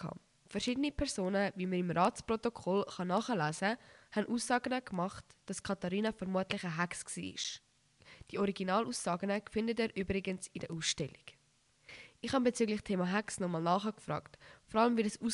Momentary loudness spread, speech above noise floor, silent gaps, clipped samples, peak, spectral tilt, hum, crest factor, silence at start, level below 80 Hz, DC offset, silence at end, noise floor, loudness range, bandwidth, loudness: 11 LU; 36 dB; none; under 0.1%; -16 dBFS; -4.5 dB/octave; none; 20 dB; 0 s; -60 dBFS; under 0.1%; 0 s; -71 dBFS; 3 LU; 11.5 kHz; -36 LUFS